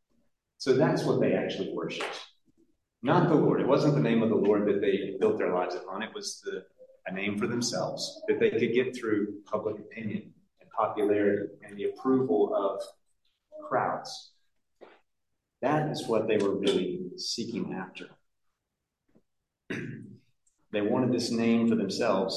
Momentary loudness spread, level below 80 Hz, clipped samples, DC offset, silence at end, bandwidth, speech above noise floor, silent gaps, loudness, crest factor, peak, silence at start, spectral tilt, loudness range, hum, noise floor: 14 LU; -72 dBFS; under 0.1%; under 0.1%; 0 s; 12.5 kHz; 57 dB; none; -29 LUFS; 20 dB; -10 dBFS; 0.6 s; -5.5 dB/octave; 8 LU; none; -85 dBFS